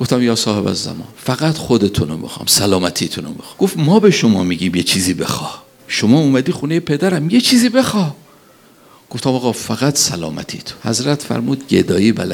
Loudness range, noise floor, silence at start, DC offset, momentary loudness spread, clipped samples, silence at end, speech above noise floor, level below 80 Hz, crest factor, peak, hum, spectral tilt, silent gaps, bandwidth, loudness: 4 LU; -46 dBFS; 0 s; under 0.1%; 12 LU; under 0.1%; 0 s; 31 dB; -48 dBFS; 16 dB; 0 dBFS; none; -4.5 dB/octave; none; 18.5 kHz; -15 LUFS